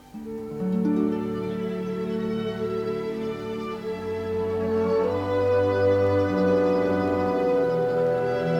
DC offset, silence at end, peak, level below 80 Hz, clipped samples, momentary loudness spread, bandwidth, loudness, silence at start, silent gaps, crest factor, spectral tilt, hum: under 0.1%; 0 s; -12 dBFS; -56 dBFS; under 0.1%; 9 LU; 10.5 kHz; -25 LUFS; 0.05 s; none; 12 dB; -8 dB/octave; none